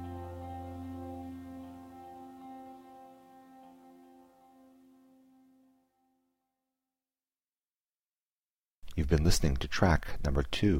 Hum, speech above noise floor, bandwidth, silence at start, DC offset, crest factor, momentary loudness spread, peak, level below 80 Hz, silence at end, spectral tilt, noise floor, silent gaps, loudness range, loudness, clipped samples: none; over 63 dB; 16 kHz; 0 s; under 0.1%; 24 dB; 27 LU; -12 dBFS; -42 dBFS; 0 s; -5.5 dB/octave; under -90 dBFS; 7.72-8.10 s, 8.20-8.66 s, 8.75-8.82 s; 25 LU; -33 LUFS; under 0.1%